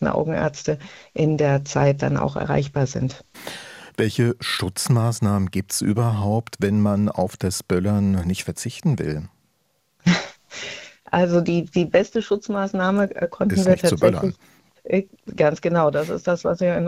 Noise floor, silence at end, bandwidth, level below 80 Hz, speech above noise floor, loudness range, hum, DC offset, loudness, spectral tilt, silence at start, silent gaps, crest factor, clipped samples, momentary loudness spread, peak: -68 dBFS; 0 s; 15.5 kHz; -52 dBFS; 47 dB; 3 LU; none; under 0.1%; -22 LUFS; -6 dB/octave; 0 s; none; 20 dB; under 0.1%; 13 LU; -2 dBFS